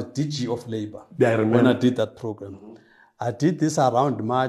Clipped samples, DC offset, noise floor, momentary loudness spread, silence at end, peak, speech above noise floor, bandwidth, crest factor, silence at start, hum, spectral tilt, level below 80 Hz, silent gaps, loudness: under 0.1%; under 0.1%; -50 dBFS; 15 LU; 0 s; -4 dBFS; 28 dB; 12.5 kHz; 20 dB; 0 s; none; -6.5 dB/octave; -66 dBFS; none; -22 LUFS